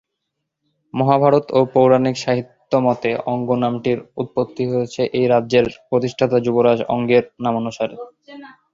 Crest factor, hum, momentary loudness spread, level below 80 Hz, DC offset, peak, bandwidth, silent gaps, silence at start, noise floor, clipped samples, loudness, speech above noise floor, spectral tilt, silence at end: 16 dB; none; 9 LU; -56 dBFS; under 0.1%; -2 dBFS; 7.6 kHz; none; 0.95 s; -77 dBFS; under 0.1%; -18 LUFS; 60 dB; -7 dB/octave; 0.2 s